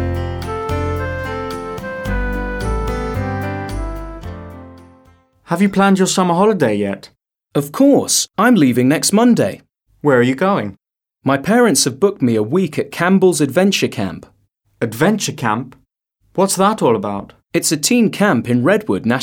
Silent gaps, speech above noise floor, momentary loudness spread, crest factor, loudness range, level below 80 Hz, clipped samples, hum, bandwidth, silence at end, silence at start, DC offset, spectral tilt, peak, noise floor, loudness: none; 48 dB; 13 LU; 16 dB; 9 LU; -34 dBFS; under 0.1%; none; 18 kHz; 0 s; 0 s; under 0.1%; -4.5 dB/octave; -2 dBFS; -62 dBFS; -16 LUFS